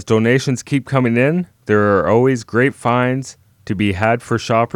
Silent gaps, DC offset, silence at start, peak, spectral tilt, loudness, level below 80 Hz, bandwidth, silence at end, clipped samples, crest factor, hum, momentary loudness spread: none; under 0.1%; 0 s; 0 dBFS; -6.5 dB/octave; -16 LUFS; -50 dBFS; 13 kHz; 0.1 s; under 0.1%; 16 dB; none; 6 LU